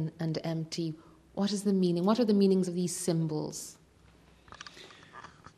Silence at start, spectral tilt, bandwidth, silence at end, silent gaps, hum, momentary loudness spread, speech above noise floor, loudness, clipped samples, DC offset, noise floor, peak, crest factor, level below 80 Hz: 0 s; -6 dB/octave; 13.5 kHz; 0.3 s; none; none; 23 LU; 31 dB; -30 LUFS; under 0.1%; under 0.1%; -60 dBFS; -14 dBFS; 18 dB; -68 dBFS